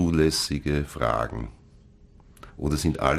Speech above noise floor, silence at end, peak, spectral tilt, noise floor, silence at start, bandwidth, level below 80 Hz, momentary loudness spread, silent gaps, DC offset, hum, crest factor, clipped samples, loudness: 28 dB; 0 s; -6 dBFS; -5 dB/octave; -52 dBFS; 0 s; 15.5 kHz; -36 dBFS; 15 LU; none; under 0.1%; none; 20 dB; under 0.1%; -26 LUFS